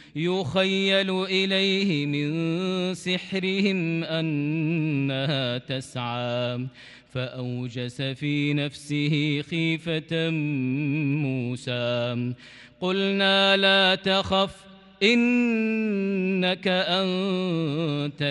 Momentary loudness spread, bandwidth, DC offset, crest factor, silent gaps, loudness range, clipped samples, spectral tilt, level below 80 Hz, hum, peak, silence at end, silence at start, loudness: 10 LU; 11.5 kHz; under 0.1%; 18 dB; none; 7 LU; under 0.1%; -6 dB/octave; -62 dBFS; none; -6 dBFS; 0 s; 0 s; -24 LUFS